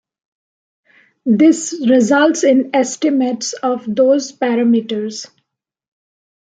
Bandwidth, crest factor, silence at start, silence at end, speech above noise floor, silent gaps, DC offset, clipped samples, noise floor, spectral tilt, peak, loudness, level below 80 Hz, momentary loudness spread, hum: 9.4 kHz; 16 dB; 1.25 s; 1.35 s; 60 dB; none; under 0.1%; under 0.1%; -74 dBFS; -4.5 dB/octave; 0 dBFS; -15 LUFS; -66 dBFS; 10 LU; none